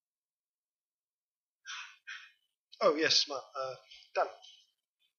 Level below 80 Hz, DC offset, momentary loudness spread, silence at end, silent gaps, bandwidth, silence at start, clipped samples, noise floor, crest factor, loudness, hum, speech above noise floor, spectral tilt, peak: under -90 dBFS; under 0.1%; 21 LU; 0.65 s; 2.59-2.68 s; 7.4 kHz; 1.65 s; under 0.1%; under -90 dBFS; 24 dB; -31 LUFS; none; over 58 dB; -1.5 dB/octave; -12 dBFS